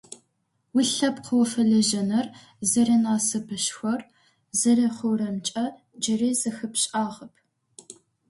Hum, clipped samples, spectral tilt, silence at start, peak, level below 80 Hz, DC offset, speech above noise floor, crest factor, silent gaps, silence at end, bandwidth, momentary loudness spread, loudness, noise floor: none; under 0.1%; -3.5 dB/octave; 0.1 s; -10 dBFS; -68 dBFS; under 0.1%; 49 dB; 16 dB; none; 0.35 s; 11.5 kHz; 10 LU; -24 LUFS; -73 dBFS